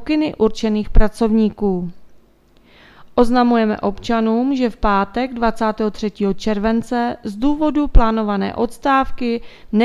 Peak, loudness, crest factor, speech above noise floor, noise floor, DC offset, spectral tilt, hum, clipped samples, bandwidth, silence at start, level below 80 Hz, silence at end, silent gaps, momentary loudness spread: 0 dBFS; -18 LUFS; 16 dB; 35 dB; -51 dBFS; under 0.1%; -7 dB/octave; none; under 0.1%; 11.5 kHz; 0 s; -26 dBFS; 0 s; none; 6 LU